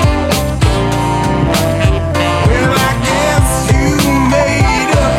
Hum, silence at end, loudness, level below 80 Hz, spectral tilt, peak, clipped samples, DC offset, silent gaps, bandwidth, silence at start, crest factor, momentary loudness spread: none; 0 s; -12 LUFS; -20 dBFS; -5 dB/octave; 0 dBFS; under 0.1%; under 0.1%; none; 16.5 kHz; 0 s; 12 dB; 3 LU